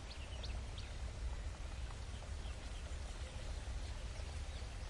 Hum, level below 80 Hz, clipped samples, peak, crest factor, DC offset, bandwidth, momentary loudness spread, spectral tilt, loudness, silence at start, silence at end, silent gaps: none; -46 dBFS; under 0.1%; -32 dBFS; 12 dB; under 0.1%; 11.5 kHz; 2 LU; -4.5 dB/octave; -48 LUFS; 0 s; 0 s; none